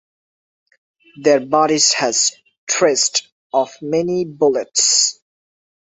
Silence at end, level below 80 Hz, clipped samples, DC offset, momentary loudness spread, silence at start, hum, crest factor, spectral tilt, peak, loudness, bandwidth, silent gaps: 0.7 s; -64 dBFS; under 0.1%; under 0.1%; 8 LU; 1.15 s; none; 18 dB; -1.5 dB/octave; 0 dBFS; -16 LUFS; 8.4 kHz; 2.58-2.67 s, 3.32-3.50 s